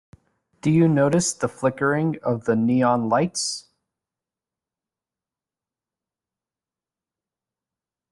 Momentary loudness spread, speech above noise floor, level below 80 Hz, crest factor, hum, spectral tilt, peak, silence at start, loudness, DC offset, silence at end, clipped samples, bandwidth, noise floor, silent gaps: 8 LU; over 69 dB; -62 dBFS; 18 dB; none; -5.5 dB/octave; -6 dBFS; 0.65 s; -21 LUFS; under 0.1%; 4.5 s; under 0.1%; 12 kHz; under -90 dBFS; none